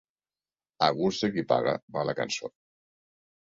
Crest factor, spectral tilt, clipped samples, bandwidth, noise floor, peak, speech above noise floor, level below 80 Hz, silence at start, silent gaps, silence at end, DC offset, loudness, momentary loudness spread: 24 dB; -4.5 dB/octave; under 0.1%; 7.8 kHz; under -90 dBFS; -6 dBFS; over 62 dB; -68 dBFS; 0.8 s; 1.82-1.88 s; 0.95 s; under 0.1%; -28 LUFS; 7 LU